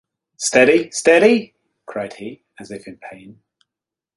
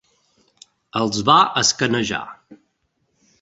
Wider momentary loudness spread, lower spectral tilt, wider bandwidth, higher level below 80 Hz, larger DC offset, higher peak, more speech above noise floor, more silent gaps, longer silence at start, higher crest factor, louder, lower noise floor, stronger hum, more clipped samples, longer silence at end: first, 23 LU vs 14 LU; about the same, -3.5 dB/octave vs -3 dB/octave; first, 11.5 kHz vs 8.2 kHz; second, -62 dBFS vs -56 dBFS; neither; about the same, 0 dBFS vs -2 dBFS; first, 70 dB vs 51 dB; neither; second, 0.4 s vs 0.95 s; about the same, 18 dB vs 20 dB; first, -15 LUFS vs -18 LUFS; first, -87 dBFS vs -70 dBFS; neither; neither; first, 1 s vs 0.85 s